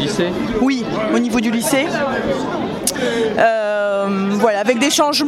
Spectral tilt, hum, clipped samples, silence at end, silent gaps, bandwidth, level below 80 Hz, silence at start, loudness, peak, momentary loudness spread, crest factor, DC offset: -4 dB/octave; none; under 0.1%; 0 s; none; 16 kHz; -46 dBFS; 0 s; -17 LUFS; 0 dBFS; 5 LU; 16 dB; under 0.1%